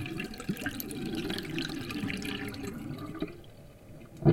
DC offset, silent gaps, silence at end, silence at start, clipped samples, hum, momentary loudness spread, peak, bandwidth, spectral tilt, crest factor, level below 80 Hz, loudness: under 0.1%; none; 0 s; 0 s; under 0.1%; none; 16 LU; -10 dBFS; 17 kHz; -5.5 dB/octave; 24 dB; -52 dBFS; -36 LUFS